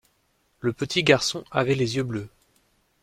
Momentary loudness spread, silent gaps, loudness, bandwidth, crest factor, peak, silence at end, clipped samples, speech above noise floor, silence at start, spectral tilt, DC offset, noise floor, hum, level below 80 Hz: 12 LU; none; -24 LUFS; 15.5 kHz; 24 dB; -2 dBFS; 0.75 s; under 0.1%; 44 dB; 0.65 s; -4.5 dB/octave; under 0.1%; -68 dBFS; none; -58 dBFS